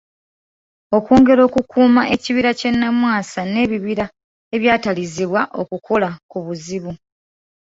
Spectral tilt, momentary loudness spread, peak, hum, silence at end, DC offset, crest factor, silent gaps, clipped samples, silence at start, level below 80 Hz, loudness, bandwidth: -5.5 dB/octave; 15 LU; -2 dBFS; none; 0.7 s; under 0.1%; 16 dB; 4.24-4.51 s, 6.23-6.29 s; under 0.1%; 0.9 s; -48 dBFS; -17 LUFS; 7.8 kHz